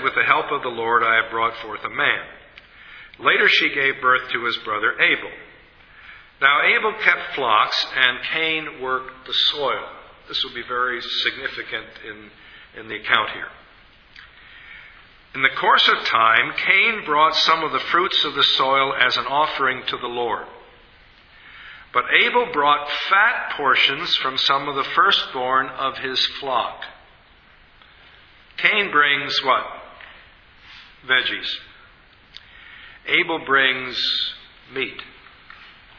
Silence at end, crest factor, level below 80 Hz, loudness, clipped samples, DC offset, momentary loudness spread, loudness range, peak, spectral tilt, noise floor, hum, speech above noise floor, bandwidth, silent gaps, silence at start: 0.3 s; 22 dB; -58 dBFS; -19 LUFS; under 0.1%; under 0.1%; 15 LU; 8 LU; 0 dBFS; -3 dB/octave; -51 dBFS; none; 31 dB; 5.4 kHz; none; 0 s